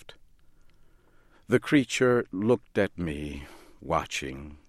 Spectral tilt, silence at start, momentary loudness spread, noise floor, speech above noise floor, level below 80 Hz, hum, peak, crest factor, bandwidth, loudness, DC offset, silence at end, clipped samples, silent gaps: -5.5 dB/octave; 0.05 s; 15 LU; -58 dBFS; 31 dB; -50 dBFS; none; -8 dBFS; 20 dB; 14.5 kHz; -27 LUFS; under 0.1%; 0.15 s; under 0.1%; none